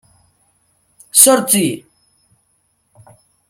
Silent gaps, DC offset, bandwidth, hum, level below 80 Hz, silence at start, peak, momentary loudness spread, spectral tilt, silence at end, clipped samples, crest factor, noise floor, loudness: none; under 0.1%; 17 kHz; none; -64 dBFS; 1.15 s; 0 dBFS; 14 LU; -2.5 dB/octave; 1.7 s; 0.1%; 18 dB; -63 dBFS; -11 LUFS